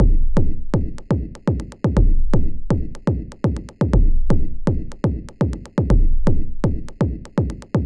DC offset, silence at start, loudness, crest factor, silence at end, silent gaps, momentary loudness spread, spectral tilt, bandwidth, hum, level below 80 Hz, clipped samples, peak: under 0.1%; 0 s; -22 LUFS; 14 dB; 0 s; none; 5 LU; -9 dB/octave; 6.8 kHz; none; -18 dBFS; under 0.1%; -2 dBFS